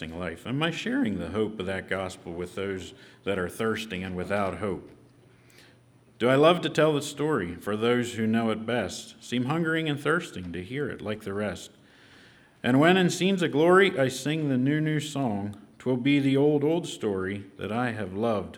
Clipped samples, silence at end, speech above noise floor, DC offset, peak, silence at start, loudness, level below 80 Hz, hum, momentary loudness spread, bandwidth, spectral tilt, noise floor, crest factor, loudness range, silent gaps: under 0.1%; 0 s; 31 dB; under 0.1%; -6 dBFS; 0 s; -27 LUFS; -62 dBFS; none; 14 LU; 17.5 kHz; -5.5 dB/octave; -58 dBFS; 22 dB; 8 LU; none